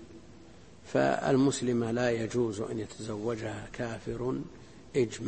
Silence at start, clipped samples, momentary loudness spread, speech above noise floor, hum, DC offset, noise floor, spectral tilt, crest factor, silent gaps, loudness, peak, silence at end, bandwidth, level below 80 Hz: 0 s; under 0.1%; 12 LU; 23 dB; none; 0.1%; -53 dBFS; -6 dB/octave; 20 dB; none; -31 LUFS; -12 dBFS; 0 s; 8.8 kHz; -58 dBFS